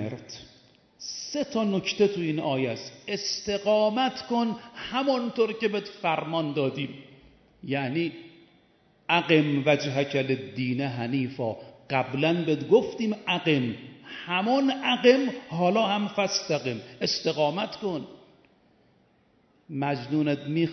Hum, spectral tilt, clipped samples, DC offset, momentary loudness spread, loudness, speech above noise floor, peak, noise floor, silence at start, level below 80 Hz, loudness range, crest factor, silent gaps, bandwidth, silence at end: none; -5 dB/octave; under 0.1%; under 0.1%; 14 LU; -26 LUFS; 38 dB; -6 dBFS; -64 dBFS; 0 s; -68 dBFS; 6 LU; 20 dB; none; 6.4 kHz; 0 s